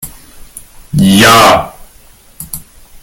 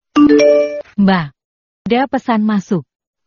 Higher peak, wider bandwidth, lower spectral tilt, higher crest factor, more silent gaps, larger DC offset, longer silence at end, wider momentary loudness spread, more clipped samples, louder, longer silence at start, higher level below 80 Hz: about the same, 0 dBFS vs 0 dBFS; first, over 20 kHz vs 7.2 kHz; second, -4 dB/octave vs -5.5 dB/octave; about the same, 12 dB vs 14 dB; second, none vs 1.44-1.85 s; neither; second, 0.05 s vs 0.45 s; first, 24 LU vs 12 LU; first, 0.6% vs under 0.1%; first, -6 LUFS vs -14 LUFS; second, 0 s vs 0.15 s; first, -36 dBFS vs -50 dBFS